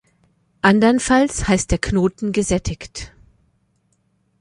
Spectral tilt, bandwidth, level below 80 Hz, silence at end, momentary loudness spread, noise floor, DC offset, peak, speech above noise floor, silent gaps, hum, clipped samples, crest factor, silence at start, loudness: -5 dB/octave; 11.5 kHz; -36 dBFS; 1.35 s; 17 LU; -64 dBFS; under 0.1%; -2 dBFS; 47 dB; none; none; under 0.1%; 18 dB; 0.65 s; -18 LUFS